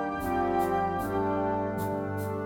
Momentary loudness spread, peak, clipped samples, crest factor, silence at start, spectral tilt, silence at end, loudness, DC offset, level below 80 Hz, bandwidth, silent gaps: 5 LU; -16 dBFS; under 0.1%; 12 dB; 0 s; -7 dB/octave; 0 s; -29 LUFS; under 0.1%; -50 dBFS; 19 kHz; none